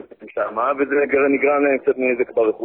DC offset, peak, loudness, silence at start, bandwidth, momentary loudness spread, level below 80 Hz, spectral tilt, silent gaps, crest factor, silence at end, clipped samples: under 0.1%; -6 dBFS; -19 LUFS; 0.2 s; 3.6 kHz; 7 LU; -60 dBFS; -10.5 dB/octave; none; 14 dB; 0 s; under 0.1%